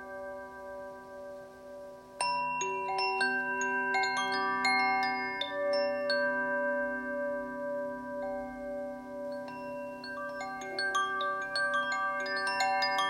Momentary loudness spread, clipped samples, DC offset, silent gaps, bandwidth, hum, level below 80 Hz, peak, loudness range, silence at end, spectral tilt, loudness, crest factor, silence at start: 15 LU; under 0.1%; under 0.1%; none; 16 kHz; none; -68 dBFS; -16 dBFS; 8 LU; 0 s; -2 dB/octave; -32 LUFS; 18 dB; 0 s